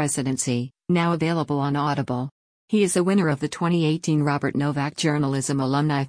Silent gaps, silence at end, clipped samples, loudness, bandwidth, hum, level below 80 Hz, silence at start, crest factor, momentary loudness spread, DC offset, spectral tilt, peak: 2.31-2.68 s; 0 s; under 0.1%; -23 LUFS; 10.5 kHz; none; -60 dBFS; 0 s; 14 dB; 5 LU; under 0.1%; -5.5 dB/octave; -8 dBFS